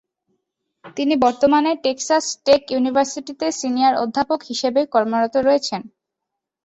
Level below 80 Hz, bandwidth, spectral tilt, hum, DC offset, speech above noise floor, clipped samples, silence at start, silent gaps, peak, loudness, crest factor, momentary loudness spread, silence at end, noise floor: -58 dBFS; 8.4 kHz; -3 dB/octave; none; under 0.1%; 64 dB; under 0.1%; 0.85 s; none; -2 dBFS; -19 LUFS; 18 dB; 8 LU; 0.8 s; -82 dBFS